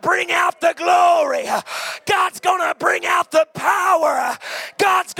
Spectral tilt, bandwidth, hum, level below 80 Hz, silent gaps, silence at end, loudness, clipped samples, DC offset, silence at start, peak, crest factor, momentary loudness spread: -2 dB/octave; 17 kHz; none; -70 dBFS; none; 0 s; -18 LUFS; under 0.1%; under 0.1%; 0.05 s; -4 dBFS; 14 dB; 8 LU